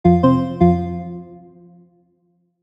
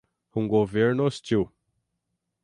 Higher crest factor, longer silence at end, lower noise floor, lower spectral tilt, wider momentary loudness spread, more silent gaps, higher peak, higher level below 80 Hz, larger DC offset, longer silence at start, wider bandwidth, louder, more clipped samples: about the same, 16 dB vs 18 dB; first, 1.25 s vs 0.95 s; second, -64 dBFS vs -80 dBFS; first, -10.5 dB/octave vs -7 dB/octave; first, 18 LU vs 10 LU; neither; first, -2 dBFS vs -8 dBFS; first, -40 dBFS vs -56 dBFS; neither; second, 0.05 s vs 0.35 s; second, 5.6 kHz vs 11 kHz; first, -17 LUFS vs -25 LUFS; neither